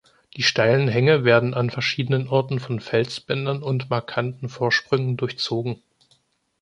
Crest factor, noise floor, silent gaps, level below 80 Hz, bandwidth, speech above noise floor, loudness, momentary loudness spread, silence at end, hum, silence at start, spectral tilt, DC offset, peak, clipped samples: 18 dB; -64 dBFS; none; -60 dBFS; 10 kHz; 42 dB; -22 LUFS; 10 LU; 0.85 s; none; 0.35 s; -5.5 dB/octave; under 0.1%; -4 dBFS; under 0.1%